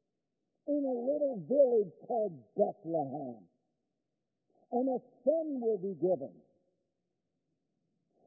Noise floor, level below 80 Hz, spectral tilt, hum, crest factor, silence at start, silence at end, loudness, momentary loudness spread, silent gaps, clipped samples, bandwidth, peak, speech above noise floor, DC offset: -87 dBFS; -90 dBFS; 0 dB/octave; none; 20 dB; 0.65 s; 1.95 s; -33 LUFS; 10 LU; none; under 0.1%; 0.9 kHz; -16 dBFS; 54 dB; under 0.1%